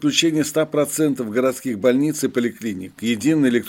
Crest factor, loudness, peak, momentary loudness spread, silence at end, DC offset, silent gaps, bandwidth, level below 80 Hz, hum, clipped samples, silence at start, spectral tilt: 18 dB; -20 LUFS; -2 dBFS; 7 LU; 0 s; under 0.1%; none; 17 kHz; -64 dBFS; none; under 0.1%; 0 s; -4.5 dB/octave